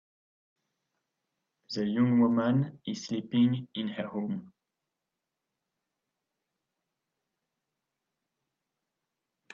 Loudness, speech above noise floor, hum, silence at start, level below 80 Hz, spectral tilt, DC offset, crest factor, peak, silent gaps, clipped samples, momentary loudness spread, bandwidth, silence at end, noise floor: -29 LUFS; 59 dB; none; 1.7 s; -76 dBFS; -7 dB/octave; under 0.1%; 20 dB; -14 dBFS; none; under 0.1%; 12 LU; 7.2 kHz; 5.05 s; -87 dBFS